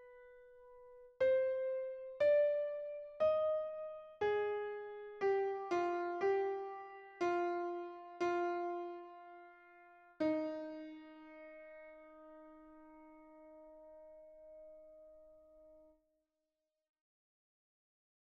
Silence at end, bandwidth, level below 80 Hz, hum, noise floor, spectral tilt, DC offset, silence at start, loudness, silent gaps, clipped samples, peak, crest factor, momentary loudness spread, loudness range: 2.55 s; 7.2 kHz; -78 dBFS; none; -90 dBFS; -5.5 dB/octave; under 0.1%; 0 s; -38 LUFS; none; under 0.1%; -24 dBFS; 16 dB; 25 LU; 22 LU